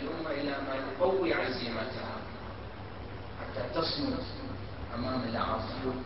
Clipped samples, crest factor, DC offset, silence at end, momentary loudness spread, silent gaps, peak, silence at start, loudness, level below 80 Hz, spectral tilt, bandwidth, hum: under 0.1%; 18 dB; 0.4%; 0 s; 13 LU; none; -16 dBFS; 0 s; -34 LUFS; -50 dBFS; -9.5 dB/octave; 5.8 kHz; none